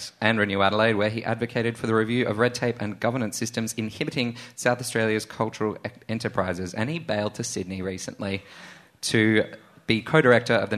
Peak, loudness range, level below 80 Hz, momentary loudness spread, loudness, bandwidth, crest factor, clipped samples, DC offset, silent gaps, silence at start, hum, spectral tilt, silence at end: -2 dBFS; 5 LU; -60 dBFS; 11 LU; -25 LUFS; 13.5 kHz; 22 dB; under 0.1%; under 0.1%; none; 0 s; none; -5 dB/octave; 0 s